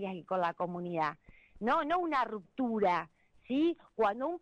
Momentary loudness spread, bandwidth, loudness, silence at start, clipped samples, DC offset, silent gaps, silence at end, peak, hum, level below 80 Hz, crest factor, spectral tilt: 7 LU; 8.6 kHz; -33 LUFS; 0 s; under 0.1%; under 0.1%; none; 0.05 s; -20 dBFS; none; -66 dBFS; 12 dB; -7 dB/octave